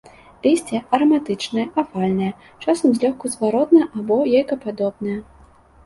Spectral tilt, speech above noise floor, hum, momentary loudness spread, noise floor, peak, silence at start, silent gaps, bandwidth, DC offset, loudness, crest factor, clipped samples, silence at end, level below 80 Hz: -6 dB/octave; 30 dB; none; 9 LU; -49 dBFS; -2 dBFS; 0.45 s; none; 11.5 kHz; under 0.1%; -20 LUFS; 18 dB; under 0.1%; 0.65 s; -56 dBFS